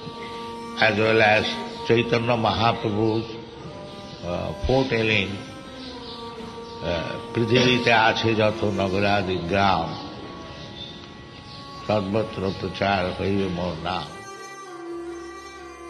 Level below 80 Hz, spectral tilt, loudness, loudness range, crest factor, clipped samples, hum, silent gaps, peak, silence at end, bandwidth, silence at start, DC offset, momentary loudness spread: -46 dBFS; -5.5 dB/octave; -22 LUFS; 6 LU; 22 dB; under 0.1%; none; none; -4 dBFS; 0 s; 12 kHz; 0 s; under 0.1%; 19 LU